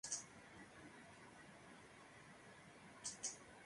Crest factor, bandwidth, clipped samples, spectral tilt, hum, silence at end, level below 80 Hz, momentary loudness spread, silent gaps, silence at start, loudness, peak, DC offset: 26 dB; 11.5 kHz; under 0.1%; -1 dB/octave; none; 0 s; -80 dBFS; 14 LU; none; 0.05 s; -54 LUFS; -30 dBFS; under 0.1%